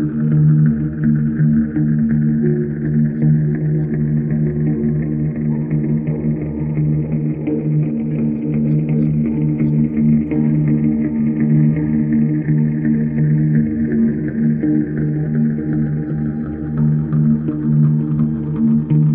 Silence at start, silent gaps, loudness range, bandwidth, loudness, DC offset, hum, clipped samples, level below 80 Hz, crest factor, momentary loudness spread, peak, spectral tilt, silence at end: 0 s; none; 3 LU; 2.7 kHz; -17 LUFS; under 0.1%; none; under 0.1%; -38 dBFS; 12 dB; 5 LU; -4 dBFS; -14.5 dB/octave; 0 s